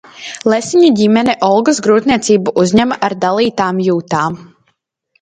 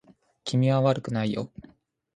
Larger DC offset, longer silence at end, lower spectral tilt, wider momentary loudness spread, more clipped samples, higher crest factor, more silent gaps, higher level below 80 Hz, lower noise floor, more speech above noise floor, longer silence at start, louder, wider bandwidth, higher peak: neither; first, 0.8 s vs 0.55 s; second, -5 dB/octave vs -7 dB/octave; second, 7 LU vs 15 LU; neither; second, 12 dB vs 20 dB; neither; first, -48 dBFS vs -62 dBFS; about the same, -63 dBFS vs -61 dBFS; first, 52 dB vs 36 dB; second, 0.15 s vs 0.45 s; first, -12 LUFS vs -26 LUFS; about the same, 9.4 kHz vs 9.6 kHz; first, 0 dBFS vs -8 dBFS